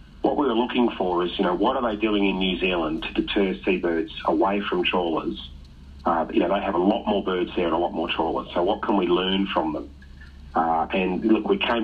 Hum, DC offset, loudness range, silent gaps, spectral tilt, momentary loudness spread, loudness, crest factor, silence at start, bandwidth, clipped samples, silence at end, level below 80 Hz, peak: none; under 0.1%; 1 LU; none; -7.5 dB/octave; 4 LU; -23 LUFS; 16 dB; 0 s; 5.4 kHz; under 0.1%; 0 s; -46 dBFS; -8 dBFS